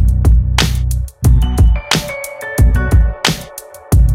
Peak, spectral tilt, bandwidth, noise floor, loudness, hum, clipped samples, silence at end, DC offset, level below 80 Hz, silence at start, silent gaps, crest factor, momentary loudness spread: 0 dBFS; -5 dB/octave; 16 kHz; -33 dBFS; -14 LUFS; none; under 0.1%; 0 s; under 0.1%; -14 dBFS; 0 s; none; 12 dB; 11 LU